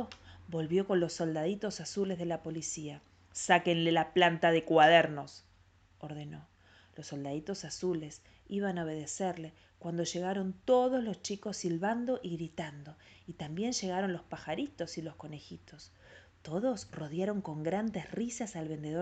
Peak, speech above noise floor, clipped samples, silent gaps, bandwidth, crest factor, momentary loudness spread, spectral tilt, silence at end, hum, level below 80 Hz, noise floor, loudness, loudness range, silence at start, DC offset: -10 dBFS; 31 dB; under 0.1%; none; 9 kHz; 24 dB; 21 LU; -4.5 dB/octave; 0 s; none; -68 dBFS; -64 dBFS; -33 LUFS; 11 LU; 0 s; under 0.1%